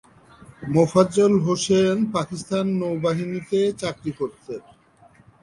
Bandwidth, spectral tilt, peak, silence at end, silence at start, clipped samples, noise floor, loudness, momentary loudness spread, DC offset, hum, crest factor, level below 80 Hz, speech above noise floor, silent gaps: 11.5 kHz; -6 dB/octave; -4 dBFS; 0.85 s; 0.6 s; under 0.1%; -54 dBFS; -22 LUFS; 13 LU; under 0.1%; none; 20 dB; -56 dBFS; 33 dB; none